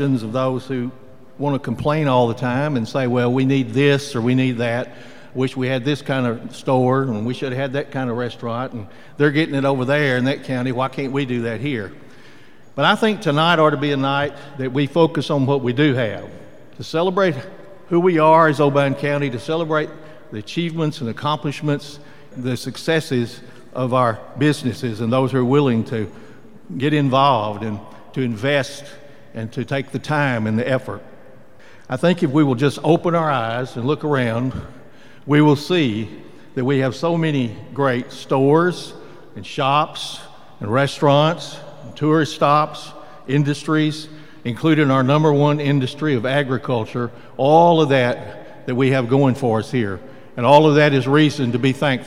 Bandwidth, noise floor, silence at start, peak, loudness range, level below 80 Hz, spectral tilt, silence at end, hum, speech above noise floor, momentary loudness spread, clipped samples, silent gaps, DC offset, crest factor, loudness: 14 kHz; -47 dBFS; 0 s; 0 dBFS; 5 LU; -58 dBFS; -6.5 dB/octave; 0 s; none; 29 dB; 15 LU; under 0.1%; none; 0.9%; 20 dB; -19 LUFS